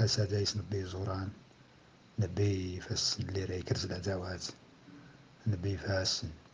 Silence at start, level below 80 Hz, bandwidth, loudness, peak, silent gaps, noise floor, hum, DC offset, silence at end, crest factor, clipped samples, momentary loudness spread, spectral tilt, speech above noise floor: 0 s; -62 dBFS; 9.8 kHz; -35 LUFS; -18 dBFS; none; -60 dBFS; none; under 0.1%; 0.05 s; 18 dB; under 0.1%; 12 LU; -4.5 dB/octave; 26 dB